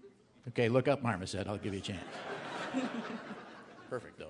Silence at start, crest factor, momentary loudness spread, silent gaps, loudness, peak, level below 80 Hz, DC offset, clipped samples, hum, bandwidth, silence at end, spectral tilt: 0.05 s; 22 dB; 17 LU; none; -36 LUFS; -16 dBFS; -72 dBFS; under 0.1%; under 0.1%; none; 11 kHz; 0 s; -6 dB/octave